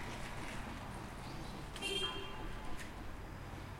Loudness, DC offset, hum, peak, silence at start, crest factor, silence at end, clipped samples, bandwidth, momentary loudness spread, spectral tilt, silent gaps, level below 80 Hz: -44 LUFS; under 0.1%; none; -26 dBFS; 0 s; 18 dB; 0 s; under 0.1%; 16.5 kHz; 11 LU; -4 dB/octave; none; -52 dBFS